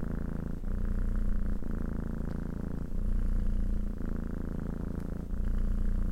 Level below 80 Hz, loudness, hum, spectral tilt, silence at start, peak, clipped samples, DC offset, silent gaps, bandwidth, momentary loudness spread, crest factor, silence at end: -32 dBFS; -37 LUFS; none; -9 dB/octave; 0 s; -18 dBFS; under 0.1%; under 0.1%; none; 3.1 kHz; 3 LU; 12 dB; 0 s